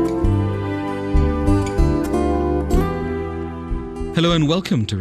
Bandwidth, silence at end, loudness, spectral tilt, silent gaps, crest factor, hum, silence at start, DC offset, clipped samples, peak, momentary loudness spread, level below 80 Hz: 13.5 kHz; 0 s; -20 LUFS; -7 dB/octave; none; 16 dB; none; 0 s; under 0.1%; under 0.1%; -2 dBFS; 9 LU; -24 dBFS